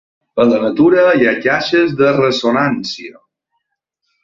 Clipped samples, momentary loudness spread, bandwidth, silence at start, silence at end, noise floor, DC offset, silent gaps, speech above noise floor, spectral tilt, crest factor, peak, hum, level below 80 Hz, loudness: under 0.1%; 13 LU; 7.4 kHz; 0.35 s; 1.15 s; -73 dBFS; under 0.1%; none; 60 dB; -6 dB/octave; 14 dB; -2 dBFS; none; -54 dBFS; -13 LUFS